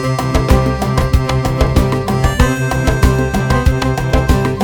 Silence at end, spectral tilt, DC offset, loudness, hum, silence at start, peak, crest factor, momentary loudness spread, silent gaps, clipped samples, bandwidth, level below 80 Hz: 0 s; -6 dB/octave; under 0.1%; -14 LUFS; none; 0 s; 0 dBFS; 12 dB; 2 LU; none; under 0.1%; 19.5 kHz; -18 dBFS